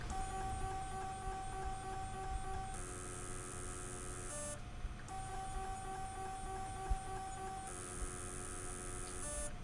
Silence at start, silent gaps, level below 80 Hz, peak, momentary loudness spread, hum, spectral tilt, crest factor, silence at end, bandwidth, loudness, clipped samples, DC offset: 0 s; none; -48 dBFS; -26 dBFS; 3 LU; none; -3.5 dB/octave; 18 dB; 0 s; 11.5 kHz; -45 LUFS; under 0.1%; under 0.1%